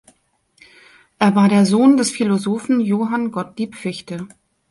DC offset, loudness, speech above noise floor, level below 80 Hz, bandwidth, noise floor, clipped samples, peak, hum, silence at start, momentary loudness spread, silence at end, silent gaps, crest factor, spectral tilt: under 0.1%; -17 LUFS; 45 dB; -62 dBFS; 11.5 kHz; -62 dBFS; under 0.1%; -2 dBFS; none; 1.2 s; 16 LU; 0.45 s; none; 16 dB; -6 dB/octave